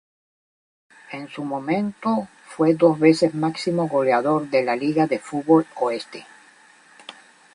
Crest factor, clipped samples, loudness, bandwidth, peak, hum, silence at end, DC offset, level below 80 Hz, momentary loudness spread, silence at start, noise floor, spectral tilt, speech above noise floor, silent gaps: 20 dB; under 0.1%; -21 LUFS; 11 kHz; -2 dBFS; none; 0.45 s; under 0.1%; -68 dBFS; 20 LU; 1.1 s; -52 dBFS; -6.5 dB/octave; 31 dB; none